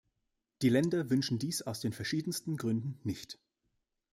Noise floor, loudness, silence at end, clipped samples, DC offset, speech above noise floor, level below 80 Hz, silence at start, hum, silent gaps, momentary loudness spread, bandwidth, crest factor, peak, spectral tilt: -84 dBFS; -34 LUFS; 0.8 s; under 0.1%; under 0.1%; 51 dB; -70 dBFS; 0.6 s; none; none; 10 LU; 16 kHz; 20 dB; -14 dBFS; -5.5 dB/octave